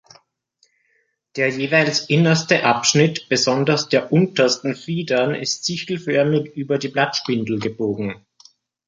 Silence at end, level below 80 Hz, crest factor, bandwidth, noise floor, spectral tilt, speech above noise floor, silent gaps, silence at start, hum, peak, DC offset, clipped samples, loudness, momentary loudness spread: 0.7 s; -62 dBFS; 18 dB; 9.4 kHz; -66 dBFS; -4.5 dB/octave; 47 dB; none; 1.35 s; none; -2 dBFS; under 0.1%; under 0.1%; -19 LUFS; 8 LU